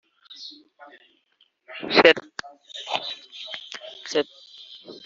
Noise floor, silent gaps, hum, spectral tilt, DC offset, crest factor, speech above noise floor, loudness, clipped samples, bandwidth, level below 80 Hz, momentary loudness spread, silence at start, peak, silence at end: -47 dBFS; none; none; 0 dB/octave; under 0.1%; 26 dB; 25 dB; -22 LUFS; under 0.1%; 7.6 kHz; -72 dBFS; 25 LU; 0.3 s; -2 dBFS; 0.05 s